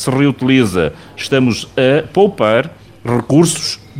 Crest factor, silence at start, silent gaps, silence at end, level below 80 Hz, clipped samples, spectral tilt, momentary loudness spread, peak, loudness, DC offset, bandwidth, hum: 14 dB; 0 s; none; 0 s; -44 dBFS; under 0.1%; -5.5 dB/octave; 8 LU; 0 dBFS; -14 LUFS; under 0.1%; 16 kHz; none